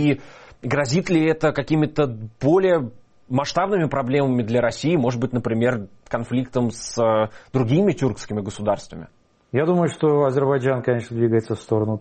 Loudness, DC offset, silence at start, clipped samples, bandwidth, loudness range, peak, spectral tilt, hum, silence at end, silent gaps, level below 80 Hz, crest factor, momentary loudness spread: -21 LUFS; under 0.1%; 0 s; under 0.1%; 8.8 kHz; 2 LU; -6 dBFS; -7 dB/octave; none; 0 s; none; -52 dBFS; 14 dB; 8 LU